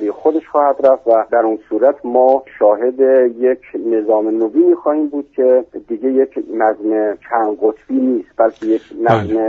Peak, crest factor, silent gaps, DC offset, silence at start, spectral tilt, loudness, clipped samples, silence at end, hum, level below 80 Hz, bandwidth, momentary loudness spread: 0 dBFS; 14 dB; none; under 0.1%; 0 s; -6.5 dB/octave; -15 LUFS; under 0.1%; 0 s; none; -56 dBFS; 4.5 kHz; 6 LU